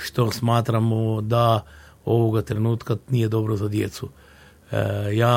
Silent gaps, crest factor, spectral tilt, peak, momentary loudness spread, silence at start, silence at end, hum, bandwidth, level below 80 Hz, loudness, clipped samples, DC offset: none; 18 dB; -7 dB/octave; -4 dBFS; 8 LU; 0 s; 0 s; none; 16.5 kHz; -52 dBFS; -23 LUFS; under 0.1%; under 0.1%